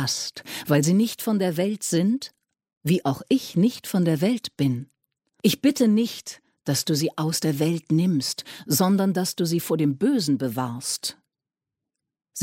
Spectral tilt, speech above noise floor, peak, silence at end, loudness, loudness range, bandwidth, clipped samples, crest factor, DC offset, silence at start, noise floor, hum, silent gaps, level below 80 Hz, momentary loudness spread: -5 dB/octave; 65 dB; -6 dBFS; 0 s; -24 LUFS; 2 LU; 17 kHz; under 0.1%; 18 dB; under 0.1%; 0 s; -88 dBFS; none; 2.77-2.81 s; -66 dBFS; 9 LU